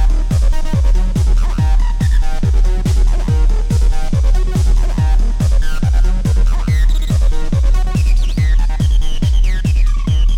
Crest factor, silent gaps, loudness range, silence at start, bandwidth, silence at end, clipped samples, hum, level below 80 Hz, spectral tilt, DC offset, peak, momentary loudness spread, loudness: 6 dB; none; 0 LU; 0 s; 10.5 kHz; 0 s; under 0.1%; none; -12 dBFS; -6.5 dB/octave; under 0.1%; -4 dBFS; 1 LU; -16 LUFS